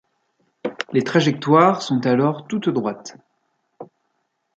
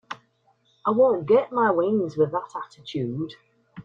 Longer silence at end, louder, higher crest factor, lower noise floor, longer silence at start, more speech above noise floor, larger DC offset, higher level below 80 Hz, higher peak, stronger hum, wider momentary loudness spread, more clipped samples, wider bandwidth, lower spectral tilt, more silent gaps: first, 0.75 s vs 0.05 s; first, -19 LUFS vs -23 LUFS; about the same, 20 dB vs 16 dB; first, -72 dBFS vs -65 dBFS; first, 0.65 s vs 0.1 s; first, 53 dB vs 42 dB; neither; about the same, -66 dBFS vs -66 dBFS; first, -2 dBFS vs -8 dBFS; neither; about the same, 17 LU vs 16 LU; neither; first, 8.2 kHz vs 7.4 kHz; about the same, -6.5 dB/octave vs -7.5 dB/octave; neither